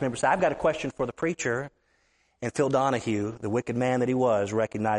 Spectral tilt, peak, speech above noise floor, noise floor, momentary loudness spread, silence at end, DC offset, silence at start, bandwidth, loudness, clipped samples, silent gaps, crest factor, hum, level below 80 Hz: -5.5 dB/octave; -10 dBFS; 42 dB; -68 dBFS; 7 LU; 0 s; under 0.1%; 0 s; 11.5 kHz; -27 LUFS; under 0.1%; none; 16 dB; none; -58 dBFS